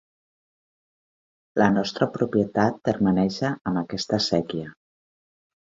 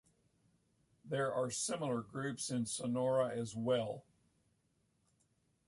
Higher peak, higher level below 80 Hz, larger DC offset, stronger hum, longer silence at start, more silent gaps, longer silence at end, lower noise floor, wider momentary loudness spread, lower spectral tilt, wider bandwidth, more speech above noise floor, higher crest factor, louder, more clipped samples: first, -4 dBFS vs -22 dBFS; first, -56 dBFS vs -76 dBFS; neither; neither; first, 1.55 s vs 1.05 s; first, 3.61-3.65 s vs none; second, 1.1 s vs 1.65 s; first, under -90 dBFS vs -78 dBFS; about the same, 8 LU vs 8 LU; first, -6 dB/octave vs -4.5 dB/octave; second, 7.8 kHz vs 11.5 kHz; first, over 67 dB vs 41 dB; about the same, 22 dB vs 18 dB; first, -24 LUFS vs -38 LUFS; neither